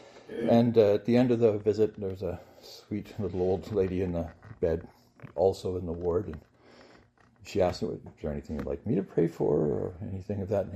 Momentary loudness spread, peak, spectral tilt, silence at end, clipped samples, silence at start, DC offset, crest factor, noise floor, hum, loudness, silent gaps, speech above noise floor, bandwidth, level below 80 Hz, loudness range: 14 LU; -10 dBFS; -8 dB/octave; 0 s; under 0.1%; 0.15 s; under 0.1%; 20 dB; -60 dBFS; none; -29 LUFS; none; 31 dB; 14 kHz; -54 dBFS; 6 LU